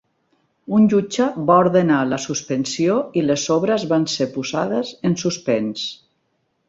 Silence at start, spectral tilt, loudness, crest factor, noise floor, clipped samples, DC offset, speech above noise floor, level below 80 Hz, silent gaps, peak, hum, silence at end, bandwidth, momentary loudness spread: 0.7 s; -5 dB/octave; -19 LUFS; 18 dB; -69 dBFS; under 0.1%; under 0.1%; 50 dB; -60 dBFS; none; -2 dBFS; none; 0.75 s; 8 kHz; 8 LU